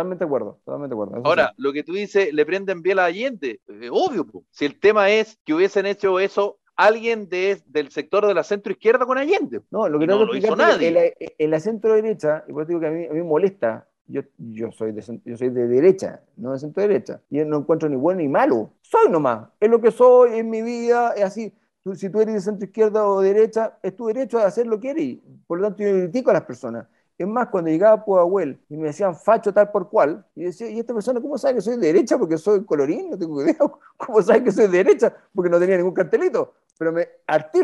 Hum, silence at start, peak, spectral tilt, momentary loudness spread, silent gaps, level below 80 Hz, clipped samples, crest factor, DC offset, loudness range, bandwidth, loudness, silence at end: none; 0 s; -4 dBFS; -6 dB/octave; 13 LU; 5.40-5.45 s, 14.01-14.05 s; -70 dBFS; under 0.1%; 16 dB; under 0.1%; 5 LU; 10.5 kHz; -20 LUFS; 0 s